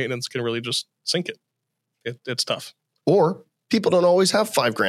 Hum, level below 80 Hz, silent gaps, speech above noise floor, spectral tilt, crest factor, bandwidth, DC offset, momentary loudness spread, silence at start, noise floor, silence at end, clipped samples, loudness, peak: none; -78 dBFS; none; 58 dB; -4 dB/octave; 18 dB; 15.5 kHz; under 0.1%; 16 LU; 0 s; -79 dBFS; 0 s; under 0.1%; -22 LUFS; -6 dBFS